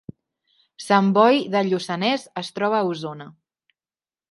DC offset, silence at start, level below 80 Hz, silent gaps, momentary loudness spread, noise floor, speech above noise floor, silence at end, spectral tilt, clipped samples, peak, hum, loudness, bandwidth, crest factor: under 0.1%; 0.8 s; -70 dBFS; none; 16 LU; under -90 dBFS; over 69 dB; 1 s; -5.5 dB/octave; under 0.1%; -2 dBFS; none; -21 LUFS; 11.5 kHz; 20 dB